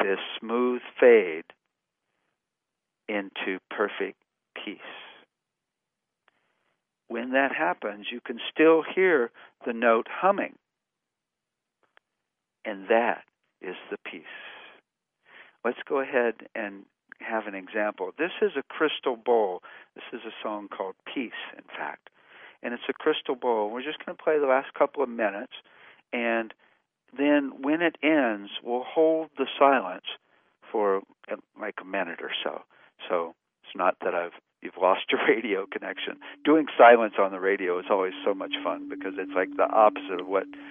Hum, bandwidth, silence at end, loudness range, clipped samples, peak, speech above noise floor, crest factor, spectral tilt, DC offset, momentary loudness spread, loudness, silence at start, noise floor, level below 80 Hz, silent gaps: none; 3.7 kHz; 0 s; 11 LU; under 0.1%; -4 dBFS; 60 dB; 24 dB; -8 dB/octave; under 0.1%; 17 LU; -26 LUFS; 0 s; -86 dBFS; -80 dBFS; none